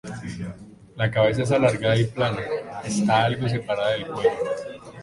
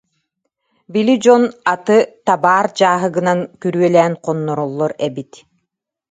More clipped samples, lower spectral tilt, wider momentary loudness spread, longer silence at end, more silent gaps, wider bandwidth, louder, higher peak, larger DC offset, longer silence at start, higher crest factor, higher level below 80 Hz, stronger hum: neither; about the same, -6 dB/octave vs -6 dB/octave; first, 14 LU vs 9 LU; second, 0 s vs 0.9 s; neither; first, 11.5 kHz vs 9.4 kHz; second, -23 LUFS vs -15 LUFS; second, -6 dBFS vs 0 dBFS; neither; second, 0.05 s vs 0.9 s; about the same, 18 dB vs 16 dB; first, -52 dBFS vs -66 dBFS; neither